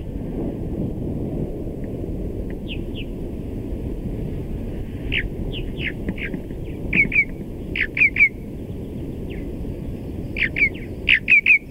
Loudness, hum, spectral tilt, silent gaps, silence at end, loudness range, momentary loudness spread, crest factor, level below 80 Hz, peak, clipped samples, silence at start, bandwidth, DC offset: -22 LUFS; none; -6.5 dB/octave; none; 0 s; 9 LU; 16 LU; 18 dB; -32 dBFS; -4 dBFS; under 0.1%; 0 s; 16 kHz; under 0.1%